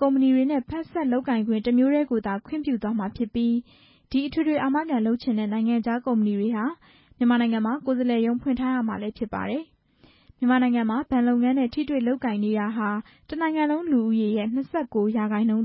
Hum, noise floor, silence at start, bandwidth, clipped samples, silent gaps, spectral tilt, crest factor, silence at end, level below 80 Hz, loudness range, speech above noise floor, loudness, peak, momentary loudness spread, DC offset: none; -58 dBFS; 0 s; 5.8 kHz; under 0.1%; none; -11 dB/octave; 14 dB; 0 s; -56 dBFS; 2 LU; 35 dB; -24 LUFS; -10 dBFS; 8 LU; under 0.1%